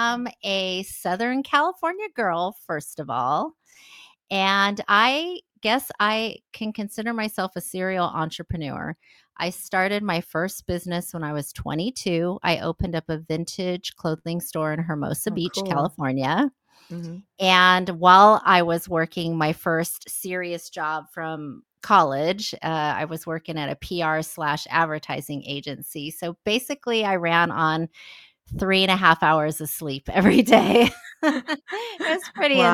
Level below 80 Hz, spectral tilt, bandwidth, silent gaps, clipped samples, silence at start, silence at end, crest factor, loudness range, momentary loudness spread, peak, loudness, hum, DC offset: -52 dBFS; -4.5 dB/octave; 17.5 kHz; none; under 0.1%; 0 s; 0 s; 22 dB; 9 LU; 14 LU; 0 dBFS; -23 LUFS; none; under 0.1%